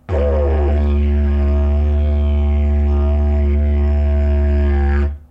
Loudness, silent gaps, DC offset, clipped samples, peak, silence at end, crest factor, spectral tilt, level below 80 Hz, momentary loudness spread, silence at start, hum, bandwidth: -17 LUFS; none; under 0.1%; under 0.1%; -6 dBFS; 0.1 s; 8 dB; -10 dB/octave; -14 dBFS; 1 LU; 0.1 s; none; 3.5 kHz